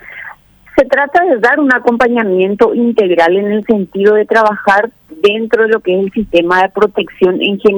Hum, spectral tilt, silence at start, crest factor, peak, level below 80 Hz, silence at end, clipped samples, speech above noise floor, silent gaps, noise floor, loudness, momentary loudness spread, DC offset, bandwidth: none; -6.5 dB/octave; 0.05 s; 10 dB; 0 dBFS; -46 dBFS; 0 s; under 0.1%; 25 dB; none; -35 dBFS; -11 LUFS; 4 LU; under 0.1%; over 20 kHz